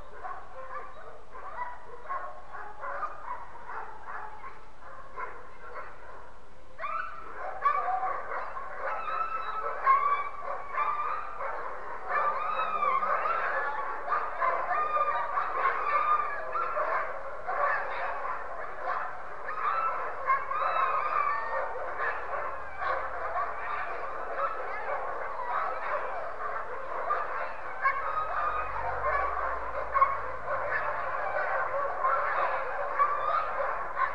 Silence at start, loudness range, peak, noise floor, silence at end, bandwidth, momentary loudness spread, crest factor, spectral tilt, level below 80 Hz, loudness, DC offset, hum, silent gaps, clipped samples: 0 s; 11 LU; -10 dBFS; -53 dBFS; 0 s; 9 kHz; 14 LU; 20 dB; -5 dB/octave; -56 dBFS; -31 LUFS; 1%; none; none; under 0.1%